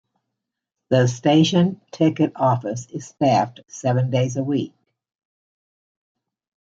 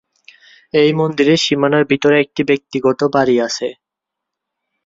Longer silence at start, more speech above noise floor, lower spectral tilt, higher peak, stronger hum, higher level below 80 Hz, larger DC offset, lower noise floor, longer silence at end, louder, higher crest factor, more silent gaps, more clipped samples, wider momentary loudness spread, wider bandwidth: first, 0.9 s vs 0.75 s; second, 63 dB vs 67 dB; first, -6.5 dB/octave vs -5 dB/octave; about the same, -4 dBFS vs -2 dBFS; neither; second, -66 dBFS vs -56 dBFS; neither; about the same, -83 dBFS vs -81 dBFS; first, 2 s vs 1.15 s; second, -20 LUFS vs -15 LUFS; about the same, 18 dB vs 14 dB; neither; neither; first, 12 LU vs 6 LU; about the same, 7.8 kHz vs 7.8 kHz